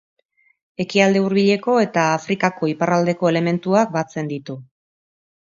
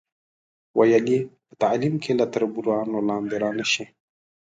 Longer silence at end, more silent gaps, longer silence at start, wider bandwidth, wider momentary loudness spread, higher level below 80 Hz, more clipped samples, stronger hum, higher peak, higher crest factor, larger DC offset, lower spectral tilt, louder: first, 0.8 s vs 0.65 s; neither; about the same, 0.8 s vs 0.75 s; second, 7.6 kHz vs 9.2 kHz; first, 12 LU vs 7 LU; about the same, -66 dBFS vs -66 dBFS; neither; neither; first, 0 dBFS vs -6 dBFS; about the same, 20 dB vs 18 dB; neither; about the same, -6 dB/octave vs -5 dB/octave; first, -19 LUFS vs -23 LUFS